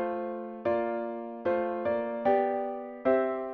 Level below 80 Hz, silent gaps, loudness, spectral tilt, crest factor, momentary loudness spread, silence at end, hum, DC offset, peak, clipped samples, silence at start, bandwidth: -68 dBFS; none; -30 LUFS; -5 dB/octave; 16 dB; 8 LU; 0 s; none; under 0.1%; -14 dBFS; under 0.1%; 0 s; 5 kHz